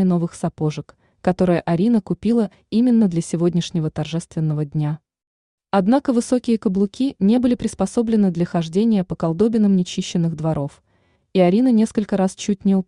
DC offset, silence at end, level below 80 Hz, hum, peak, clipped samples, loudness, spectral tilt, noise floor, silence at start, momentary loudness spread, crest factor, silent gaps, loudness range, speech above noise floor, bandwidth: under 0.1%; 0.05 s; -52 dBFS; none; -4 dBFS; under 0.1%; -19 LUFS; -7 dB/octave; -62 dBFS; 0 s; 8 LU; 14 dB; 5.27-5.58 s; 2 LU; 44 dB; 11 kHz